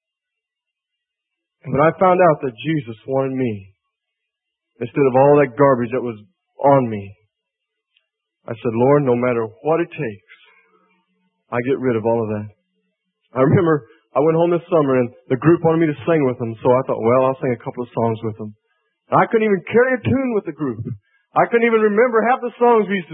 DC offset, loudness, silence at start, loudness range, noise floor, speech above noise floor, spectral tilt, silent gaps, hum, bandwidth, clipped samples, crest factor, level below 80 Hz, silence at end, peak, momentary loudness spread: under 0.1%; -18 LUFS; 1.65 s; 4 LU; -83 dBFS; 66 dB; -12.5 dB/octave; none; none; 3.8 kHz; under 0.1%; 18 dB; -58 dBFS; 0 s; 0 dBFS; 13 LU